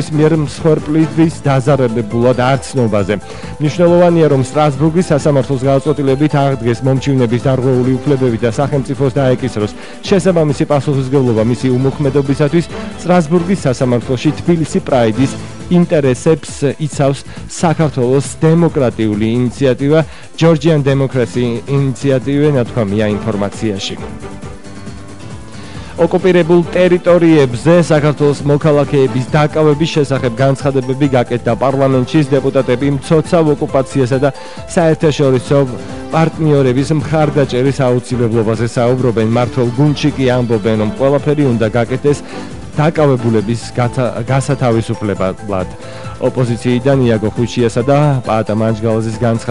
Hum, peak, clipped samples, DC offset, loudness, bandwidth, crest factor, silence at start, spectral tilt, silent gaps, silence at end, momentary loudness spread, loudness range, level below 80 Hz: none; 0 dBFS; under 0.1%; 2%; -13 LUFS; 11.5 kHz; 12 dB; 0 s; -7 dB/octave; none; 0 s; 7 LU; 3 LU; -38 dBFS